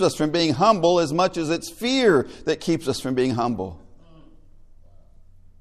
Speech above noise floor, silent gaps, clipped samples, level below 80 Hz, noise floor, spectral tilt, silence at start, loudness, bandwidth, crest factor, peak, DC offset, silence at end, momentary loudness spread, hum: 27 dB; none; under 0.1%; -50 dBFS; -48 dBFS; -5 dB/octave; 0 s; -21 LUFS; 14 kHz; 18 dB; -4 dBFS; under 0.1%; 1.85 s; 8 LU; none